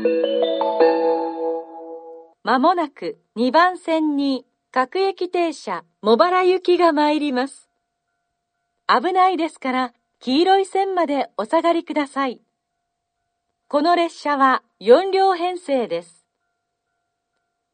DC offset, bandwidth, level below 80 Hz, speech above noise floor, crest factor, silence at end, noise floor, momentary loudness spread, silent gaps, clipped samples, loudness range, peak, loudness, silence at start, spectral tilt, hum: under 0.1%; 9.4 kHz; -74 dBFS; 58 dB; 20 dB; 1.7 s; -77 dBFS; 13 LU; none; under 0.1%; 3 LU; 0 dBFS; -19 LUFS; 0 s; -4.5 dB/octave; none